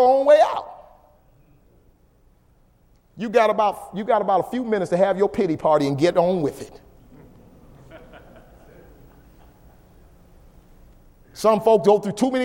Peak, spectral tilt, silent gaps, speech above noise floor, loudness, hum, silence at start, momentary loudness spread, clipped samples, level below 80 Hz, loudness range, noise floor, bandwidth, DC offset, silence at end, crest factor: -4 dBFS; -6 dB/octave; none; 38 dB; -20 LUFS; none; 0 s; 14 LU; under 0.1%; -54 dBFS; 7 LU; -57 dBFS; 16.5 kHz; under 0.1%; 0 s; 18 dB